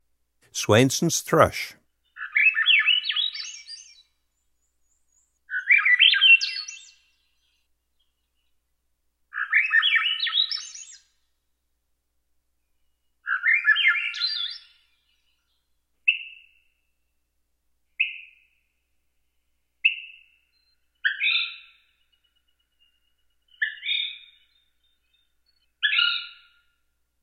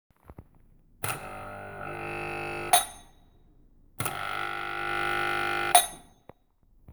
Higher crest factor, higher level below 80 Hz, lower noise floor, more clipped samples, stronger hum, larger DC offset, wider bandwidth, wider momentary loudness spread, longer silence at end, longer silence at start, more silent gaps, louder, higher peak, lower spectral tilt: about the same, 26 dB vs 28 dB; second, -64 dBFS vs -54 dBFS; first, -74 dBFS vs -63 dBFS; neither; first, 60 Hz at -75 dBFS vs none; neither; second, 16.5 kHz vs over 20 kHz; first, 21 LU vs 17 LU; first, 0.95 s vs 0 s; first, 0.55 s vs 0.3 s; neither; first, -20 LUFS vs -28 LUFS; about the same, -2 dBFS vs -4 dBFS; about the same, -2.5 dB/octave vs -1.5 dB/octave